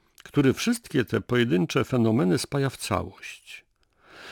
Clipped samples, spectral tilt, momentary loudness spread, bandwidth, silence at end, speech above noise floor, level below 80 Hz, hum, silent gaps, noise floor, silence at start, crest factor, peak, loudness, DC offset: under 0.1%; -5.5 dB/octave; 19 LU; 19 kHz; 0 s; 33 dB; -56 dBFS; none; none; -58 dBFS; 0.25 s; 18 dB; -8 dBFS; -25 LUFS; under 0.1%